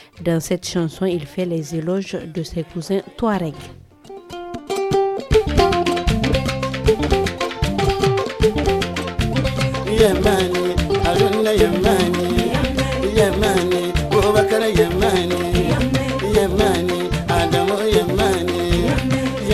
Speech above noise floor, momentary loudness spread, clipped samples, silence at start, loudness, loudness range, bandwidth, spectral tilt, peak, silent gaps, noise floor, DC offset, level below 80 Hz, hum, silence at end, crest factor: 19 dB; 8 LU; under 0.1%; 0.15 s; -18 LUFS; 6 LU; 16 kHz; -5.5 dB/octave; -2 dBFS; none; -39 dBFS; under 0.1%; -30 dBFS; none; 0 s; 18 dB